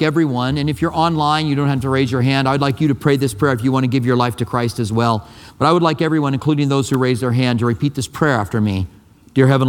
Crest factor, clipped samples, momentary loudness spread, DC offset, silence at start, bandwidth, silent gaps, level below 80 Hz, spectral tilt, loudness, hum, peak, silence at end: 16 dB; under 0.1%; 4 LU; under 0.1%; 0 s; 16 kHz; none; -46 dBFS; -6.5 dB/octave; -17 LUFS; none; 0 dBFS; 0 s